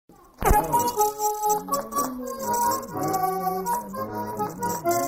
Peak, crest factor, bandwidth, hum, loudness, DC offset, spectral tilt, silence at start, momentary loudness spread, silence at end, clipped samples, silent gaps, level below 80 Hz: -6 dBFS; 18 dB; 16.5 kHz; none; -25 LUFS; under 0.1%; -4 dB/octave; 0.1 s; 8 LU; 0 s; under 0.1%; none; -36 dBFS